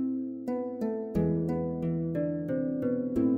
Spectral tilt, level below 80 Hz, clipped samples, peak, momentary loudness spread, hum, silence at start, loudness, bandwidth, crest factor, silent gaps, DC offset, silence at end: -11 dB/octave; -52 dBFS; under 0.1%; -16 dBFS; 5 LU; none; 0 s; -31 LUFS; 4.8 kHz; 14 dB; none; under 0.1%; 0 s